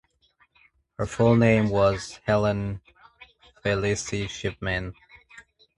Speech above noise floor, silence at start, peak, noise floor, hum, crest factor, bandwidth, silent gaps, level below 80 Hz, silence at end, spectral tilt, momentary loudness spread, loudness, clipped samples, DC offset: 41 dB; 1 s; -6 dBFS; -65 dBFS; none; 20 dB; 11 kHz; none; -46 dBFS; 0.4 s; -6 dB/octave; 14 LU; -24 LUFS; under 0.1%; under 0.1%